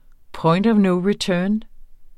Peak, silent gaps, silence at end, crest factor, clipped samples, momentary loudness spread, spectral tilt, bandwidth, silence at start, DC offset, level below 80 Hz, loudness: -6 dBFS; none; 0.05 s; 14 dB; under 0.1%; 7 LU; -6.5 dB/octave; 11.5 kHz; 0.3 s; under 0.1%; -46 dBFS; -19 LUFS